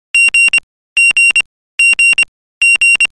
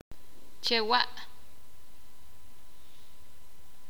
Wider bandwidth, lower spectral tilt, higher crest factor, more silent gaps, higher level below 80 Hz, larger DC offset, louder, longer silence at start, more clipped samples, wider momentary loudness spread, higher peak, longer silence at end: second, 14.5 kHz vs over 20 kHz; second, 3.5 dB/octave vs -2.5 dB/octave; second, 6 dB vs 28 dB; first, 0.63-0.96 s, 1.46-1.78 s, 2.28-2.61 s vs none; first, -50 dBFS vs -62 dBFS; second, under 0.1% vs 2%; first, -8 LUFS vs -28 LUFS; second, 0.15 s vs 0.65 s; neither; second, 8 LU vs 26 LU; first, -4 dBFS vs -8 dBFS; second, 0.15 s vs 2.65 s